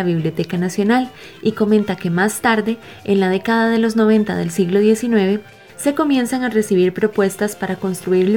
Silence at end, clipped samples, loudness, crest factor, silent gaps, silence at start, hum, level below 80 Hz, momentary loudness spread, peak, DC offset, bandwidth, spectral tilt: 0 s; under 0.1%; -17 LUFS; 16 dB; none; 0 s; none; -56 dBFS; 7 LU; -2 dBFS; 0.2%; 18 kHz; -6 dB/octave